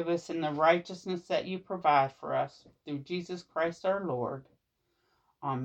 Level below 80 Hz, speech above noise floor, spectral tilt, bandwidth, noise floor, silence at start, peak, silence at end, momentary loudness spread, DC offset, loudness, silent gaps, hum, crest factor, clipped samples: -72 dBFS; 47 dB; -6 dB/octave; 8.6 kHz; -78 dBFS; 0 s; -12 dBFS; 0 s; 13 LU; under 0.1%; -32 LUFS; none; none; 20 dB; under 0.1%